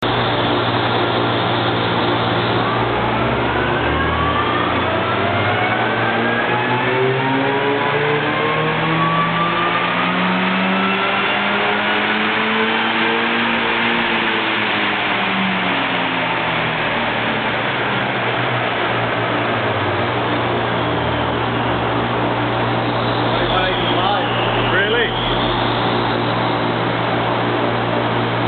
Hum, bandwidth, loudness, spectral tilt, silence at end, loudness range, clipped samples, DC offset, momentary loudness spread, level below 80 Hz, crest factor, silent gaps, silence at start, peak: none; 4.6 kHz; -17 LUFS; -8.5 dB/octave; 0 s; 2 LU; under 0.1%; under 0.1%; 2 LU; -40 dBFS; 16 dB; none; 0 s; -2 dBFS